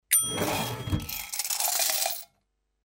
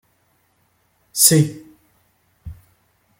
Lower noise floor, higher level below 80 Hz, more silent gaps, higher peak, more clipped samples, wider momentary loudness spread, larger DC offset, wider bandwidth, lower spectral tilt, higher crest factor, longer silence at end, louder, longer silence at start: first, -75 dBFS vs -63 dBFS; about the same, -48 dBFS vs -52 dBFS; neither; second, -6 dBFS vs 0 dBFS; neither; second, 9 LU vs 28 LU; neither; about the same, 16.5 kHz vs 17 kHz; second, -2 dB/octave vs -3.5 dB/octave; about the same, 24 dB vs 24 dB; about the same, 0.6 s vs 0.65 s; second, -27 LUFS vs -15 LUFS; second, 0.1 s vs 1.15 s